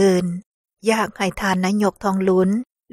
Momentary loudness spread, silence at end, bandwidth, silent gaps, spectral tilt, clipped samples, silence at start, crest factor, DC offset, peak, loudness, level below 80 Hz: 8 LU; 0.3 s; 14 kHz; 0.46-0.64 s; -6 dB/octave; under 0.1%; 0 s; 16 dB; under 0.1%; -4 dBFS; -20 LUFS; -50 dBFS